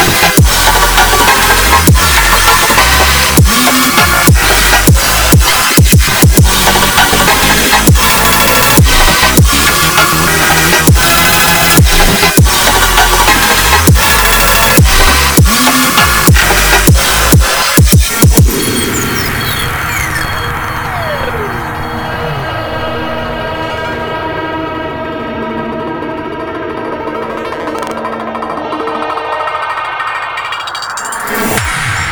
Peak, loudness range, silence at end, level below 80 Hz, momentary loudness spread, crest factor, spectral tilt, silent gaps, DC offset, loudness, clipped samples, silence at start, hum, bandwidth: 0 dBFS; 11 LU; 0 s; -16 dBFS; 12 LU; 8 dB; -3 dB/octave; none; under 0.1%; -8 LUFS; 0.3%; 0 s; none; over 20 kHz